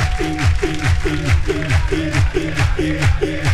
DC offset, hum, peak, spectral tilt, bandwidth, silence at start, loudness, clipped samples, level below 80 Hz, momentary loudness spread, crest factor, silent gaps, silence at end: under 0.1%; none; -4 dBFS; -6 dB/octave; 13 kHz; 0 s; -18 LUFS; under 0.1%; -22 dBFS; 1 LU; 12 dB; none; 0 s